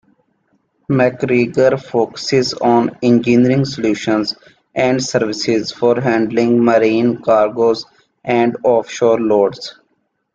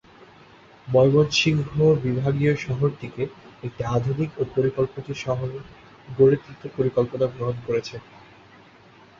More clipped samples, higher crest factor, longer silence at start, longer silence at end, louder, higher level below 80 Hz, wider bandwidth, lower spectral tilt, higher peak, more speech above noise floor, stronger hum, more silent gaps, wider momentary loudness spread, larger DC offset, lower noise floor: neither; about the same, 14 dB vs 18 dB; about the same, 0.9 s vs 0.85 s; second, 0.65 s vs 1.2 s; first, -15 LUFS vs -23 LUFS; about the same, -54 dBFS vs -52 dBFS; about the same, 7.8 kHz vs 7.6 kHz; about the same, -6 dB/octave vs -6.5 dB/octave; first, -2 dBFS vs -6 dBFS; first, 52 dB vs 28 dB; neither; neither; second, 6 LU vs 14 LU; neither; first, -66 dBFS vs -51 dBFS